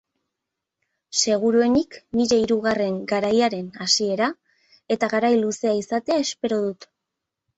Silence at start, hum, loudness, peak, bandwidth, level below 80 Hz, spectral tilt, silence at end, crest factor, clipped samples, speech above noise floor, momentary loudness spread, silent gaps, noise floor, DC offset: 1.1 s; none; -22 LUFS; -4 dBFS; 8.2 kHz; -60 dBFS; -3.5 dB/octave; 0.75 s; 18 dB; under 0.1%; 62 dB; 7 LU; none; -83 dBFS; under 0.1%